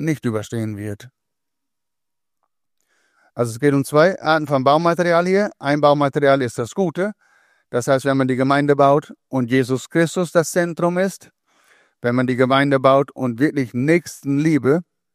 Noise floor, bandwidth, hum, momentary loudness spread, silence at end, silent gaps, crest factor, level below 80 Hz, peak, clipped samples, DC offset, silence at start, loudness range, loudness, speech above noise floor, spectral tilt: -85 dBFS; 15.5 kHz; none; 10 LU; 0.3 s; none; 18 dB; -64 dBFS; 0 dBFS; under 0.1%; under 0.1%; 0 s; 6 LU; -18 LUFS; 68 dB; -6 dB/octave